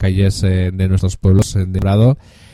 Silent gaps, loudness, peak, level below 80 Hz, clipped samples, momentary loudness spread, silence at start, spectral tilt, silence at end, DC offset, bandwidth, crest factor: none; -15 LUFS; 0 dBFS; -30 dBFS; under 0.1%; 5 LU; 0 s; -7 dB/octave; 0.4 s; under 0.1%; 12 kHz; 14 dB